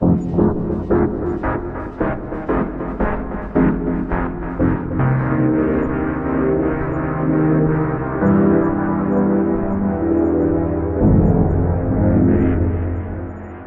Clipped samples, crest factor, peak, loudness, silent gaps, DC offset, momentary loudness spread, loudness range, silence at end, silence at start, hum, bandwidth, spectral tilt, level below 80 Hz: under 0.1%; 16 dB; -2 dBFS; -18 LUFS; none; under 0.1%; 8 LU; 4 LU; 0 s; 0 s; none; 3.4 kHz; -12 dB/octave; -30 dBFS